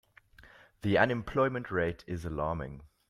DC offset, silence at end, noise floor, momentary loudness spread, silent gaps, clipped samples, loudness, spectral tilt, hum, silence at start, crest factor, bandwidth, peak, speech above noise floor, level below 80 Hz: under 0.1%; 0.25 s; -58 dBFS; 11 LU; none; under 0.1%; -31 LUFS; -7.5 dB/octave; none; 0.4 s; 22 dB; 13.5 kHz; -10 dBFS; 27 dB; -52 dBFS